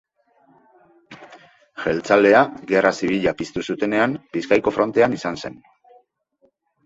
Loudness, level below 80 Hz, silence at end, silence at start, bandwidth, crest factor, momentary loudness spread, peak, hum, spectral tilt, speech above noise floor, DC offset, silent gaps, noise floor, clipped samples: -19 LUFS; -56 dBFS; 1.35 s; 1.1 s; 8 kHz; 20 dB; 13 LU; -2 dBFS; none; -5.5 dB/octave; 44 dB; under 0.1%; none; -63 dBFS; under 0.1%